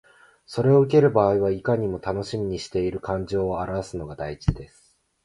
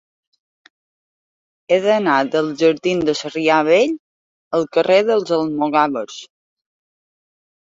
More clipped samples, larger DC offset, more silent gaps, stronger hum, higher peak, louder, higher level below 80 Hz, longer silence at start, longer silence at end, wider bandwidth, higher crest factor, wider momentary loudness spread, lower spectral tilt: neither; neither; second, none vs 3.99-4.51 s; neither; about the same, -4 dBFS vs -2 dBFS; second, -23 LUFS vs -17 LUFS; first, -42 dBFS vs -62 dBFS; second, 0.5 s vs 1.7 s; second, 0.6 s vs 1.5 s; first, 11.5 kHz vs 7.8 kHz; about the same, 18 dB vs 18 dB; first, 14 LU vs 8 LU; first, -7.5 dB/octave vs -5 dB/octave